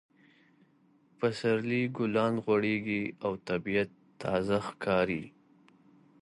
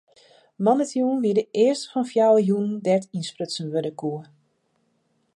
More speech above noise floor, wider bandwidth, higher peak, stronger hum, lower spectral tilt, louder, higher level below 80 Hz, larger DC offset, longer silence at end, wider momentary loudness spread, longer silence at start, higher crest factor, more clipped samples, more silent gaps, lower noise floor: second, 35 dB vs 47 dB; about the same, 11.5 kHz vs 11.5 kHz; second, -14 dBFS vs -6 dBFS; neither; about the same, -7 dB/octave vs -6 dB/octave; second, -31 LUFS vs -23 LUFS; first, -64 dBFS vs -76 dBFS; neither; second, 0.95 s vs 1.1 s; second, 7 LU vs 12 LU; first, 1.2 s vs 0.6 s; about the same, 18 dB vs 18 dB; neither; neither; about the same, -66 dBFS vs -69 dBFS